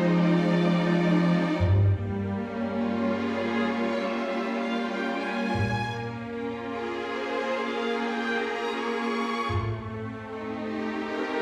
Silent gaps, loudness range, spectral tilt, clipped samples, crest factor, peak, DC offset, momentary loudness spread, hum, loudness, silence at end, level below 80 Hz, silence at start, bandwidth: none; 5 LU; -7.5 dB/octave; under 0.1%; 14 dB; -12 dBFS; under 0.1%; 10 LU; none; -28 LUFS; 0 s; -52 dBFS; 0 s; 8.8 kHz